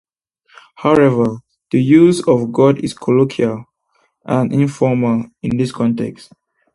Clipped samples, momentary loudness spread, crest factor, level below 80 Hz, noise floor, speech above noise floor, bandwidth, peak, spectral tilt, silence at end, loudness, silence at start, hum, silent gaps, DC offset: under 0.1%; 10 LU; 16 dB; -52 dBFS; -62 dBFS; 48 dB; 11.5 kHz; 0 dBFS; -7.5 dB/octave; 0.6 s; -15 LUFS; 0.8 s; none; none; under 0.1%